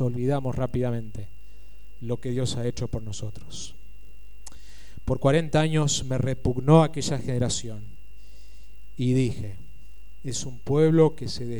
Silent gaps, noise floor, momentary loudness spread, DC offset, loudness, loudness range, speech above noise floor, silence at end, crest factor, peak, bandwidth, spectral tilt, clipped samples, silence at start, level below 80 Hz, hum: none; -49 dBFS; 21 LU; 3%; -25 LUFS; 10 LU; 25 dB; 0 s; 22 dB; -4 dBFS; 17 kHz; -6 dB/octave; under 0.1%; 0 s; -44 dBFS; 50 Hz at -50 dBFS